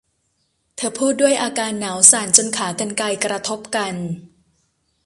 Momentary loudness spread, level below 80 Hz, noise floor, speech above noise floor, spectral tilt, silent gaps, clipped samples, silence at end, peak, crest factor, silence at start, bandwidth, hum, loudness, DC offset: 15 LU; -62 dBFS; -68 dBFS; 49 dB; -2 dB/octave; none; under 0.1%; 0.8 s; 0 dBFS; 20 dB; 0.8 s; 16 kHz; none; -17 LUFS; under 0.1%